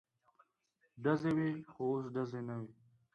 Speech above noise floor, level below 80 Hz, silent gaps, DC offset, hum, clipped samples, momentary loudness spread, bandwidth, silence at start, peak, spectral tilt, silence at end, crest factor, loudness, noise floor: 43 dB; -74 dBFS; none; under 0.1%; none; under 0.1%; 11 LU; 8.2 kHz; 0.95 s; -20 dBFS; -8.5 dB/octave; 0.4 s; 18 dB; -38 LUFS; -79 dBFS